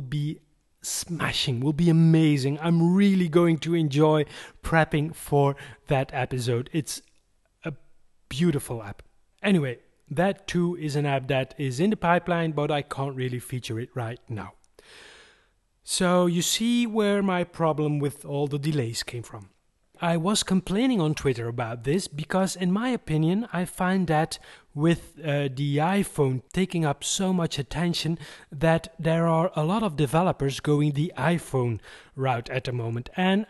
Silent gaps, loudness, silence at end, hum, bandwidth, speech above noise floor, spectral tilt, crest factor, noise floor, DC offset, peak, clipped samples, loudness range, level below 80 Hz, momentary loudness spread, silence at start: none; -25 LUFS; 0.05 s; none; 12.5 kHz; 41 dB; -5.5 dB/octave; 20 dB; -65 dBFS; under 0.1%; -6 dBFS; under 0.1%; 7 LU; -52 dBFS; 13 LU; 0 s